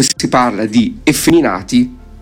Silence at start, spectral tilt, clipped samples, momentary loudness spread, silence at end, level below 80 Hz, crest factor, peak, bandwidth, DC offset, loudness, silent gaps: 0 s; -4 dB/octave; under 0.1%; 4 LU; 0 s; -36 dBFS; 12 dB; 0 dBFS; 19 kHz; under 0.1%; -13 LUFS; none